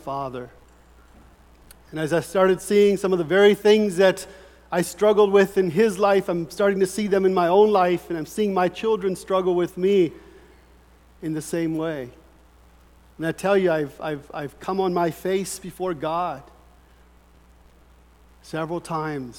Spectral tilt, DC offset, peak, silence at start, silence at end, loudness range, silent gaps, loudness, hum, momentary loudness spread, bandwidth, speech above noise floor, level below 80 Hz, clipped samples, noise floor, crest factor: -5.5 dB/octave; under 0.1%; -4 dBFS; 0.05 s; 0 s; 11 LU; none; -22 LUFS; none; 14 LU; 17 kHz; 32 dB; -54 dBFS; under 0.1%; -53 dBFS; 18 dB